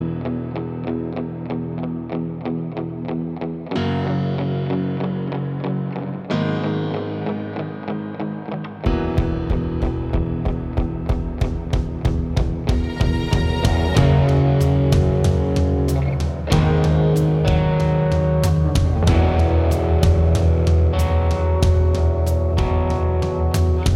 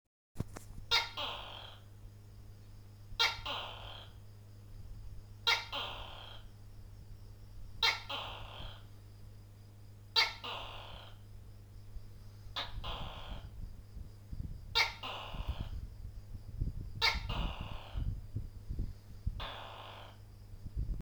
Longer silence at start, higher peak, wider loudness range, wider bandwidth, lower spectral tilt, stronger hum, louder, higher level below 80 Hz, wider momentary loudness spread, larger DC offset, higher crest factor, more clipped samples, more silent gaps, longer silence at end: second, 0 s vs 0.35 s; first, 0 dBFS vs -16 dBFS; about the same, 7 LU vs 8 LU; second, 13.5 kHz vs over 20 kHz; first, -7.5 dB/octave vs -3 dB/octave; neither; first, -20 LUFS vs -37 LUFS; first, -24 dBFS vs -48 dBFS; second, 10 LU vs 24 LU; neither; second, 18 dB vs 26 dB; neither; neither; about the same, 0 s vs 0 s